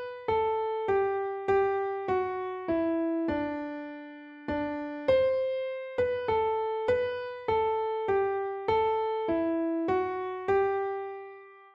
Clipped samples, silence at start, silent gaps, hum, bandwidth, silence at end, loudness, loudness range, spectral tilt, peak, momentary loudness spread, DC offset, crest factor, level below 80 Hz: under 0.1%; 0 s; none; none; 6.6 kHz; 0.05 s; -29 LUFS; 2 LU; -7.5 dB/octave; -14 dBFS; 9 LU; under 0.1%; 14 dB; -60 dBFS